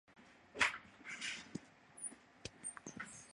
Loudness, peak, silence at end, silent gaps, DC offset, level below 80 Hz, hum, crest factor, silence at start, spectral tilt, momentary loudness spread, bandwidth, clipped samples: -43 LUFS; -18 dBFS; 0 s; none; under 0.1%; -74 dBFS; none; 30 dB; 0.1 s; -1 dB/octave; 18 LU; 11.5 kHz; under 0.1%